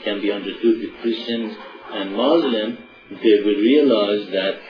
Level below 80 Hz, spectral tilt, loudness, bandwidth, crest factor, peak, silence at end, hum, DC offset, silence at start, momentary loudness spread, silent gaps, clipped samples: -62 dBFS; -7 dB/octave; -19 LUFS; 5.4 kHz; 16 dB; -4 dBFS; 0 s; none; under 0.1%; 0 s; 15 LU; none; under 0.1%